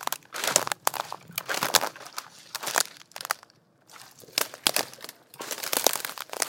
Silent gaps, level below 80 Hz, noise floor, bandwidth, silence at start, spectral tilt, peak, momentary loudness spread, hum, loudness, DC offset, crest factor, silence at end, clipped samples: none; -78 dBFS; -58 dBFS; 17 kHz; 0 s; 0 dB/octave; 0 dBFS; 16 LU; none; -27 LUFS; under 0.1%; 30 dB; 0 s; under 0.1%